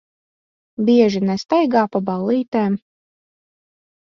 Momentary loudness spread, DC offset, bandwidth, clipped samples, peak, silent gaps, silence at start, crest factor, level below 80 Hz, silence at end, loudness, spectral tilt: 8 LU; under 0.1%; 7.2 kHz; under 0.1%; -2 dBFS; 2.48-2.52 s; 0.8 s; 18 dB; -62 dBFS; 1.25 s; -18 LUFS; -7 dB/octave